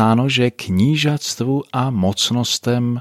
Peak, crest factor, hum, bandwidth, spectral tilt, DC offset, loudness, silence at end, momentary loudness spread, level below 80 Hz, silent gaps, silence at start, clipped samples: -2 dBFS; 14 dB; none; 15 kHz; -5 dB/octave; under 0.1%; -18 LUFS; 0 s; 5 LU; -54 dBFS; none; 0 s; under 0.1%